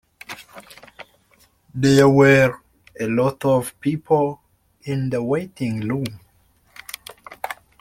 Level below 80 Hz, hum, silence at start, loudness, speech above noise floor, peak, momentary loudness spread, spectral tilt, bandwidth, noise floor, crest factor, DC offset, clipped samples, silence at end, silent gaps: -54 dBFS; none; 0.3 s; -19 LUFS; 41 dB; -2 dBFS; 24 LU; -6.5 dB/octave; 16 kHz; -59 dBFS; 20 dB; under 0.1%; under 0.1%; 0.3 s; none